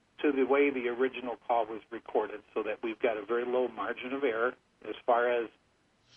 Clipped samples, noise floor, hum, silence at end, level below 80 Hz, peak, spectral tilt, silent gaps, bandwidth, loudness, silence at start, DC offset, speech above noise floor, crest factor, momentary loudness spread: under 0.1%; -69 dBFS; none; 0.7 s; -74 dBFS; -14 dBFS; -6.5 dB/octave; none; 4.2 kHz; -31 LUFS; 0.2 s; under 0.1%; 38 dB; 16 dB; 11 LU